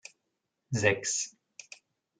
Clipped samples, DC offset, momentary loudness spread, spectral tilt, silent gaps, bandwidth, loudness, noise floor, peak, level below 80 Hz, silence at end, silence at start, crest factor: under 0.1%; under 0.1%; 24 LU; -3 dB/octave; none; 10 kHz; -30 LUFS; -83 dBFS; -8 dBFS; -74 dBFS; 0.9 s; 0.7 s; 26 dB